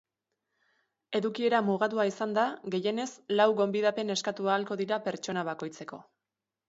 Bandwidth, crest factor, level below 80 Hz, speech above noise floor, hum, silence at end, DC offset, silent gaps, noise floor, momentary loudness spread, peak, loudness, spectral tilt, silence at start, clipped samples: 8 kHz; 20 dB; -80 dBFS; 60 dB; none; 0.65 s; under 0.1%; none; -89 dBFS; 10 LU; -10 dBFS; -30 LUFS; -4.5 dB/octave; 1.1 s; under 0.1%